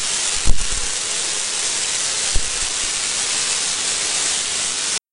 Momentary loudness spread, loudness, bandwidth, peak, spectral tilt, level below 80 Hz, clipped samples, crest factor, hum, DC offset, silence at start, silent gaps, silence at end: 3 LU; -18 LUFS; 11 kHz; 0 dBFS; 0.5 dB/octave; -28 dBFS; under 0.1%; 18 dB; none; under 0.1%; 0 s; none; 0.15 s